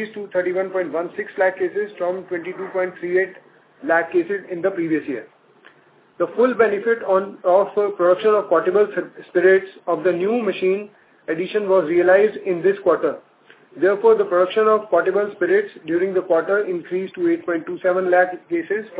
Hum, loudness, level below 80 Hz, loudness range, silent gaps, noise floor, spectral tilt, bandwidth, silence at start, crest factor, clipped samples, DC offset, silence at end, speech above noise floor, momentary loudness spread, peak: none; -20 LUFS; -70 dBFS; 5 LU; none; -53 dBFS; -10 dB/octave; 4 kHz; 0 s; 16 dB; under 0.1%; under 0.1%; 0 s; 34 dB; 10 LU; -2 dBFS